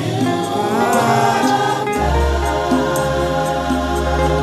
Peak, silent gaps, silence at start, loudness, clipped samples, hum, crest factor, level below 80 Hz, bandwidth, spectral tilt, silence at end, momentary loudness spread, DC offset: -4 dBFS; none; 0 s; -17 LUFS; under 0.1%; none; 14 dB; -26 dBFS; 14 kHz; -5.5 dB/octave; 0 s; 4 LU; under 0.1%